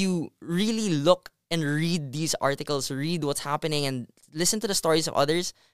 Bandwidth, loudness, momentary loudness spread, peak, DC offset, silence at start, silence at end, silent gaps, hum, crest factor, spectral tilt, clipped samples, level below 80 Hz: 16 kHz; -26 LUFS; 7 LU; -6 dBFS; 0.5%; 0 s; 0 s; none; none; 20 dB; -4 dB/octave; under 0.1%; -58 dBFS